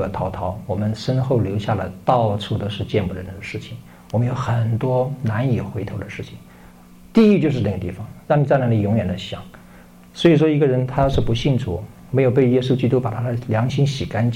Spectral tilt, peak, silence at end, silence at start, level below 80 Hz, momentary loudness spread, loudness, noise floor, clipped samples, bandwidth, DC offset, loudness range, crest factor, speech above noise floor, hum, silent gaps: -8 dB/octave; -4 dBFS; 0 s; 0 s; -40 dBFS; 15 LU; -20 LUFS; -44 dBFS; under 0.1%; 11.5 kHz; under 0.1%; 5 LU; 14 dB; 25 dB; none; none